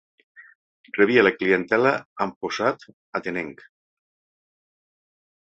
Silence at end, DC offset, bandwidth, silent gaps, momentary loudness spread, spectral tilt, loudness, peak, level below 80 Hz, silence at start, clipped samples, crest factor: 2 s; under 0.1%; 7.8 kHz; 0.55-0.84 s, 2.05-2.16 s, 2.36-2.41 s, 2.93-3.13 s; 15 LU; -5.5 dB/octave; -22 LUFS; -4 dBFS; -66 dBFS; 0.4 s; under 0.1%; 22 dB